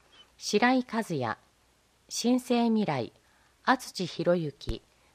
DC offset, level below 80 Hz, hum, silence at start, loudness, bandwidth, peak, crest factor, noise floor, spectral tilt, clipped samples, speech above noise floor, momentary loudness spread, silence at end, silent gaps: under 0.1%; -52 dBFS; none; 0.4 s; -29 LUFS; 15.5 kHz; -8 dBFS; 22 dB; -66 dBFS; -4.5 dB/octave; under 0.1%; 38 dB; 14 LU; 0.35 s; none